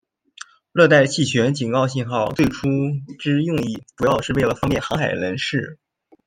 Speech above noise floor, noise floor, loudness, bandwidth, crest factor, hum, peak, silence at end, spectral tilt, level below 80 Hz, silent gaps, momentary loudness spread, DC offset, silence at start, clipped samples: 24 dB; -43 dBFS; -20 LUFS; 16 kHz; 18 dB; none; -2 dBFS; 0.5 s; -5.5 dB/octave; -46 dBFS; none; 11 LU; under 0.1%; 0.75 s; under 0.1%